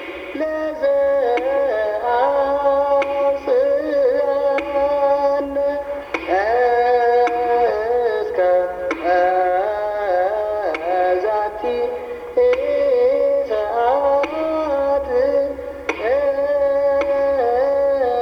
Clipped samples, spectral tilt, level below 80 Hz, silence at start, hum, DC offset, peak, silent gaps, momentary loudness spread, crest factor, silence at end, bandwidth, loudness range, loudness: under 0.1%; -5.5 dB/octave; -48 dBFS; 0 s; none; under 0.1%; -4 dBFS; none; 6 LU; 14 dB; 0 s; 6.6 kHz; 2 LU; -18 LUFS